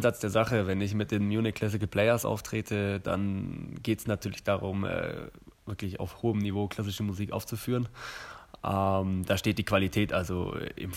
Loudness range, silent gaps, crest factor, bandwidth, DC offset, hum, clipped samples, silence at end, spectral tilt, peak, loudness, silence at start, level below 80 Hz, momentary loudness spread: 4 LU; none; 20 dB; 16 kHz; under 0.1%; none; under 0.1%; 0 s; -6 dB/octave; -10 dBFS; -30 LUFS; 0 s; -54 dBFS; 11 LU